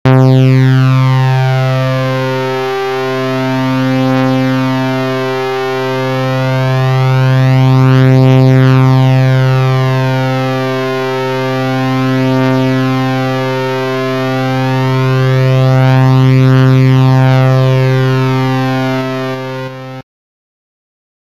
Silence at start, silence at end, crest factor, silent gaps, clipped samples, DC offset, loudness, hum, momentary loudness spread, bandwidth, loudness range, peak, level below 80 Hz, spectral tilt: 0.05 s; 1.35 s; 10 dB; none; under 0.1%; 1%; -11 LUFS; none; 8 LU; 7.2 kHz; 5 LU; 0 dBFS; -44 dBFS; -7.5 dB/octave